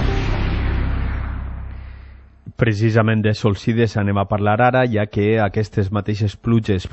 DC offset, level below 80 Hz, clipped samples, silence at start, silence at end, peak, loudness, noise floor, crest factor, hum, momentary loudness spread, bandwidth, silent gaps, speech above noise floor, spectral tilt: under 0.1%; -28 dBFS; under 0.1%; 0 s; 0.05 s; -2 dBFS; -19 LUFS; -40 dBFS; 16 dB; none; 14 LU; 8 kHz; none; 23 dB; -7.5 dB/octave